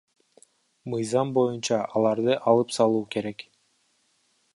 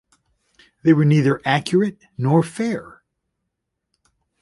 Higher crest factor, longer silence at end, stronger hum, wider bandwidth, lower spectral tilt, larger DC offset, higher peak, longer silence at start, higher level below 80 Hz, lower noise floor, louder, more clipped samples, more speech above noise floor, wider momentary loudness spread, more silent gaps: about the same, 20 dB vs 18 dB; second, 1.15 s vs 1.55 s; neither; about the same, 11.5 kHz vs 11.5 kHz; second, -5.5 dB/octave vs -7 dB/octave; neither; second, -6 dBFS vs -2 dBFS; about the same, 0.85 s vs 0.85 s; second, -72 dBFS vs -60 dBFS; second, -69 dBFS vs -78 dBFS; second, -25 LUFS vs -19 LUFS; neither; second, 45 dB vs 60 dB; about the same, 12 LU vs 10 LU; neither